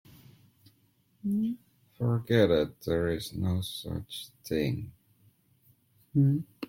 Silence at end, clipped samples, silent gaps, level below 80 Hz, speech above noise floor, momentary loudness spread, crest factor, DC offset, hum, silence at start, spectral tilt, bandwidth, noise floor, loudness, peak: 0.05 s; under 0.1%; none; -56 dBFS; 39 dB; 13 LU; 22 dB; under 0.1%; none; 1.25 s; -7 dB/octave; 16.5 kHz; -68 dBFS; -30 LUFS; -10 dBFS